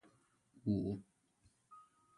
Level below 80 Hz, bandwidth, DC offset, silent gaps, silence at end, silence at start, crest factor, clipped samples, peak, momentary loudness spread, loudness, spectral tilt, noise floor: -66 dBFS; 11 kHz; under 0.1%; none; 0.35 s; 0.55 s; 20 dB; under 0.1%; -24 dBFS; 24 LU; -41 LUFS; -10 dB/octave; -75 dBFS